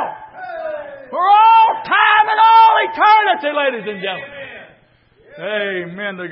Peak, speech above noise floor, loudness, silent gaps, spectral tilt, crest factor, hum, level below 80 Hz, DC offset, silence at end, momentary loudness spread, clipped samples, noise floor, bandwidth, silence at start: 0 dBFS; 31 dB; -13 LUFS; none; -8 dB/octave; 14 dB; none; -64 dBFS; under 0.1%; 0 s; 21 LU; under 0.1%; -53 dBFS; 5.8 kHz; 0 s